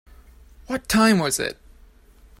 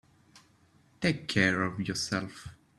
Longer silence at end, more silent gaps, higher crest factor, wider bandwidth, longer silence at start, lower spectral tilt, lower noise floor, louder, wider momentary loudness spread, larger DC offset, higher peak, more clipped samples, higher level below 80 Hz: first, 0.85 s vs 0.3 s; neither; about the same, 20 dB vs 24 dB; first, 16 kHz vs 12.5 kHz; first, 0.7 s vs 0.35 s; about the same, -4 dB/octave vs -4.5 dB/octave; second, -51 dBFS vs -64 dBFS; first, -21 LUFS vs -30 LUFS; about the same, 13 LU vs 12 LU; neither; first, -4 dBFS vs -8 dBFS; neither; first, -46 dBFS vs -62 dBFS